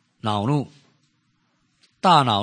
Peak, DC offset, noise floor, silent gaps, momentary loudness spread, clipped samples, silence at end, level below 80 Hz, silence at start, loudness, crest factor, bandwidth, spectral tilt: -2 dBFS; under 0.1%; -67 dBFS; none; 10 LU; under 0.1%; 0 s; -68 dBFS; 0.25 s; -20 LUFS; 22 dB; 9.8 kHz; -6 dB/octave